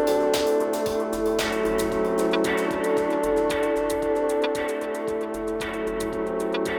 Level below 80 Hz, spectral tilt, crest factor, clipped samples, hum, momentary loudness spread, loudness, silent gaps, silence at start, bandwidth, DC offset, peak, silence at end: -46 dBFS; -4 dB/octave; 14 dB; under 0.1%; none; 6 LU; -25 LUFS; none; 0 s; over 20 kHz; under 0.1%; -10 dBFS; 0 s